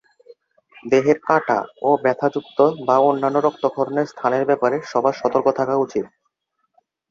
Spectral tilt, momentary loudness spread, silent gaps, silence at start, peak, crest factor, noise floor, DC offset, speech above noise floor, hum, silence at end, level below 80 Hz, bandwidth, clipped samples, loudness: -6.5 dB/octave; 6 LU; none; 0.85 s; -2 dBFS; 18 dB; -72 dBFS; under 0.1%; 54 dB; none; 1.05 s; -66 dBFS; 7.4 kHz; under 0.1%; -19 LUFS